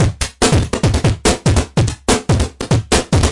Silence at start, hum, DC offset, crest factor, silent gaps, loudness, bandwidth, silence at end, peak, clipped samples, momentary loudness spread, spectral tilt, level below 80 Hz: 0 s; none; under 0.1%; 12 dB; none; -15 LUFS; 11.5 kHz; 0 s; -2 dBFS; under 0.1%; 4 LU; -5 dB/octave; -24 dBFS